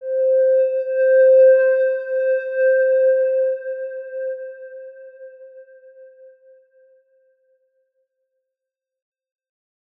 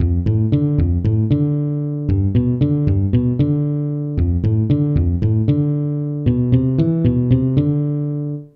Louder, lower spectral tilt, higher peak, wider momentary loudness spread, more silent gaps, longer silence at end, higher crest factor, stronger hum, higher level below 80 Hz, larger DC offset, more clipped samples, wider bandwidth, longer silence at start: about the same, -17 LUFS vs -18 LUFS; second, -3.5 dB/octave vs -12.5 dB/octave; second, -6 dBFS vs -2 dBFS; first, 20 LU vs 5 LU; neither; first, 3.95 s vs 0.1 s; about the same, 14 dB vs 14 dB; neither; second, under -90 dBFS vs -30 dBFS; neither; neither; second, 2.8 kHz vs 4.3 kHz; about the same, 0 s vs 0 s